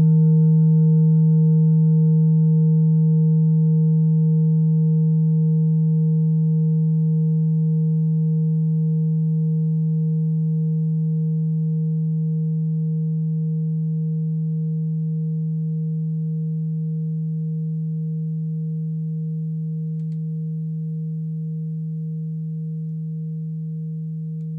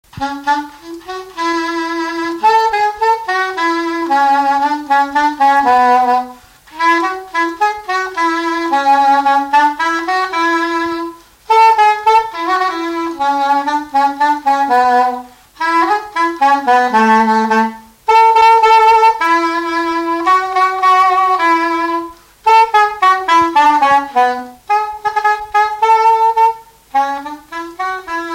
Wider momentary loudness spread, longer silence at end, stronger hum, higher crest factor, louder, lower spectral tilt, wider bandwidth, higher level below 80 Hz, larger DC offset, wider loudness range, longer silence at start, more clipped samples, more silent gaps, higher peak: about the same, 12 LU vs 10 LU; about the same, 0 s vs 0 s; neither; about the same, 10 dB vs 12 dB; second, -21 LUFS vs -13 LUFS; first, -15.5 dB/octave vs -3 dB/octave; second, 0.9 kHz vs 16 kHz; second, -66 dBFS vs -52 dBFS; neither; first, 10 LU vs 4 LU; second, 0 s vs 0.15 s; neither; neither; second, -10 dBFS vs 0 dBFS